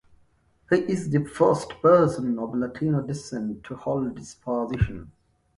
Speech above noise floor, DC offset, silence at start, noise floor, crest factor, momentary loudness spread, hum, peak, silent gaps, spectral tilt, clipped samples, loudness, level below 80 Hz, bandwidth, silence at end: 38 dB; under 0.1%; 0.7 s; -62 dBFS; 18 dB; 13 LU; none; -6 dBFS; none; -7.5 dB/octave; under 0.1%; -25 LUFS; -44 dBFS; 11.5 kHz; 0.45 s